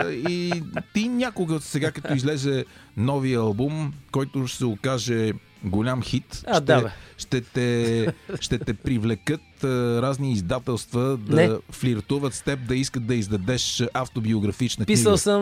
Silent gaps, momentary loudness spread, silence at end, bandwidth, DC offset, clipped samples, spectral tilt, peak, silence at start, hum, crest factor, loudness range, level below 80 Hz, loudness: none; 8 LU; 0 s; 15.5 kHz; under 0.1%; under 0.1%; -5.5 dB/octave; -4 dBFS; 0 s; none; 20 dB; 2 LU; -48 dBFS; -24 LUFS